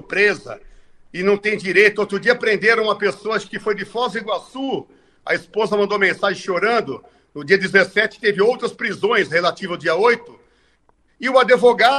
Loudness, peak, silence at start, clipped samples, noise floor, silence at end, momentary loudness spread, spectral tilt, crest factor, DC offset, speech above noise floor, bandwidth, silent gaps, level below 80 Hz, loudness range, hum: -18 LUFS; 0 dBFS; 0.1 s; under 0.1%; -59 dBFS; 0 s; 12 LU; -4.5 dB/octave; 18 dB; under 0.1%; 41 dB; 11 kHz; none; -58 dBFS; 4 LU; none